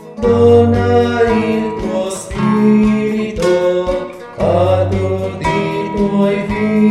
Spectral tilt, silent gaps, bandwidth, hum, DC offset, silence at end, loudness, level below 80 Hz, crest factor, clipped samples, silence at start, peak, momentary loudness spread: -7 dB/octave; none; 11.5 kHz; none; under 0.1%; 0 s; -14 LUFS; -34 dBFS; 14 dB; under 0.1%; 0 s; 0 dBFS; 8 LU